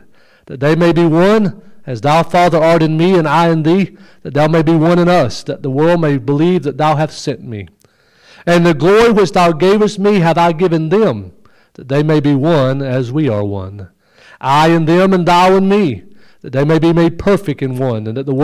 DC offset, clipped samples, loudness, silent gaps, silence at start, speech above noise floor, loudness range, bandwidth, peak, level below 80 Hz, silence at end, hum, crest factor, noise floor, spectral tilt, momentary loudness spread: under 0.1%; under 0.1%; -12 LUFS; none; 0.5 s; 38 dB; 3 LU; 14.5 kHz; -4 dBFS; -44 dBFS; 0 s; none; 8 dB; -50 dBFS; -7 dB/octave; 12 LU